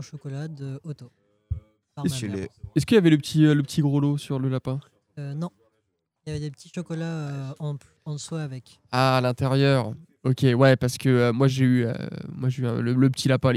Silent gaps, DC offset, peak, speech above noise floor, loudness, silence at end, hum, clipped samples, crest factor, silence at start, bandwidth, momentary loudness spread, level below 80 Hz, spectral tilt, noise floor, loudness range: none; under 0.1%; -6 dBFS; 52 dB; -24 LUFS; 0 s; none; under 0.1%; 18 dB; 0 s; 14 kHz; 17 LU; -52 dBFS; -6.5 dB/octave; -75 dBFS; 12 LU